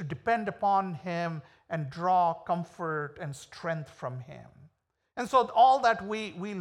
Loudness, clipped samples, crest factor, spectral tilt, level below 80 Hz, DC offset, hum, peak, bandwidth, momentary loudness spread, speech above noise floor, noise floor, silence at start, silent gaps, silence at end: -29 LUFS; under 0.1%; 20 dB; -6 dB/octave; -68 dBFS; under 0.1%; none; -10 dBFS; 12 kHz; 18 LU; 44 dB; -73 dBFS; 0 s; none; 0 s